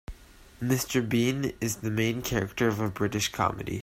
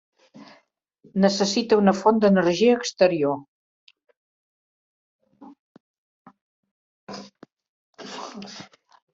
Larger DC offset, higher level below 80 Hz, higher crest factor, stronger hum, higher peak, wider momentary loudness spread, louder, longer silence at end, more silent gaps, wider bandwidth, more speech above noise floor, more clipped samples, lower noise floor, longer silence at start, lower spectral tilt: neither; first, -50 dBFS vs -68 dBFS; about the same, 20 dB vs 20 dB; neither; second, -10 dBFS vs -4 dBFS; second, 4 LU vs 22 LU; second, -28 LUFS vs -20 LUFS; second, 0 s vs 0.5 s; second, none vs 3.48-3.87 s, 4.17-5.19 s, 5.59-6.25 s, 6.41-6.63 s, 6.71-7.07 s, 7.68-7.93 s; first, 16 kHz vs 7.8 kHz; second, 21 dB vs 43 dB; neither; second, -49 dBFS vs -63 dBFS; second, 0.1 s vs 0.4 s; about the same, -5 dB/octave vs -5.5 dB/octave